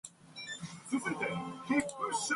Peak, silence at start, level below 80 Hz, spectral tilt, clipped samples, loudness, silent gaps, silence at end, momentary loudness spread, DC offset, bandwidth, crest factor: -18 dBFS; 0.05 s; -72 dBFS; -3.5 dB/octave; under 0.1%; -36 LUFS; none; 0 s; 11 LU; under 0.1%; 11.5 kHz; 20 dB